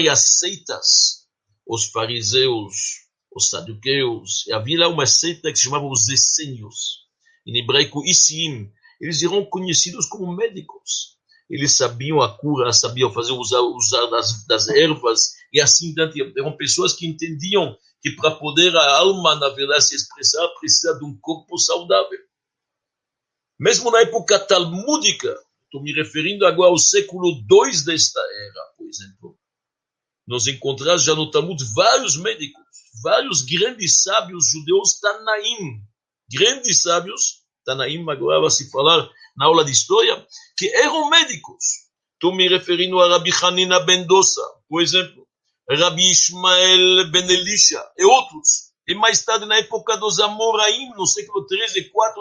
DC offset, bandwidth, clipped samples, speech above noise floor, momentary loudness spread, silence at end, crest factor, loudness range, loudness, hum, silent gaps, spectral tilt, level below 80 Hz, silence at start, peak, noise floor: under 0.1%; 11 kHz; under 0.1%; 68 dB; 14 LU; 0 s; 18 dB; 6 LU; -16 LUFS; none; none; -1.5 dB/octave; -64 dBFS; 0 s; 0 dBFS; -86 dBFS